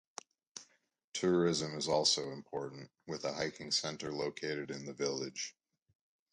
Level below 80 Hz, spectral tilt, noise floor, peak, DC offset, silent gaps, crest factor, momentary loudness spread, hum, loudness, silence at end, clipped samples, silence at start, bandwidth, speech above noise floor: -74 dBFS; -3.5 dB/octave; -75 dBFS; -16 dBFS; under 0.1%; 1.04-1.12 s; 22 dB; 21 LU; none; -36 LUFS; 0.8 s; under 0.1%; 0.55 s; 11 kHz; 39 dB